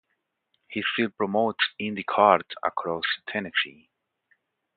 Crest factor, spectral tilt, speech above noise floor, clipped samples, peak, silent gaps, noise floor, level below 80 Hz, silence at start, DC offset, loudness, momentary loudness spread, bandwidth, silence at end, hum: 24 dB; -8.5 dB/octave; 52 dB; under 0.1%; -2 dBFS; none; -78 dBFS; -68 dBFS; 0.7 s; under 0.1%; -25 LUFS; 10 LU; 4.8 kHz; 1.05 s; none